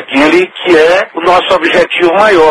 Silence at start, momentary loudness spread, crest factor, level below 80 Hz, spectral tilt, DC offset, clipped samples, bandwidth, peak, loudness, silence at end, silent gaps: 0 s; 3 LU; 8 dB; -42 dBFS; -4 dB/octave; under 0.1%; 1%; 12 kHz; 0 dBFS; -8 LUFS; 0 s; none